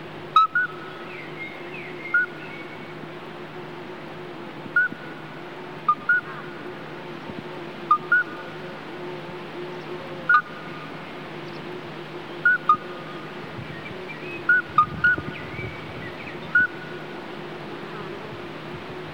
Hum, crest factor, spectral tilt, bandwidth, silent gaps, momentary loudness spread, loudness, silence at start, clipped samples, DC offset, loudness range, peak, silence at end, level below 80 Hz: none; 22 dB; -5.5 dB/octave; 16.5 kHz; none; 17 LU; -26 LUFS; 0 s; under 0.1%; 0.4%; 7 LU; -6 dBFS; 0 s; -60 dBFS